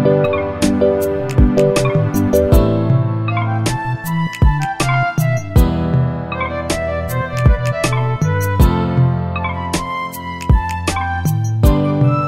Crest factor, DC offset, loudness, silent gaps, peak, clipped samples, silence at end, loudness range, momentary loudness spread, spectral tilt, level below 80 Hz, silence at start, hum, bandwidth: 14 dB; under 0.1%; -16 LUFS; none; 0 dBFS; under 0.1%; 0 s; 3 LU; 7 LU; -6.5 dB/octave; -22 dBFS; 0 s; none; 16 kHz